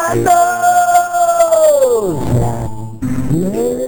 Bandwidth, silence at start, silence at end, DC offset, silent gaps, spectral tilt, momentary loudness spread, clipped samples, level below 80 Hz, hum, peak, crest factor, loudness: over 20 kHz; 0 s; 0 s; under 0.1%; none; -5.5 dB/octave; 11 LU; under 0.1%; -34 dBFS; none; 0 dBFS; 12 dB; -13 LUFS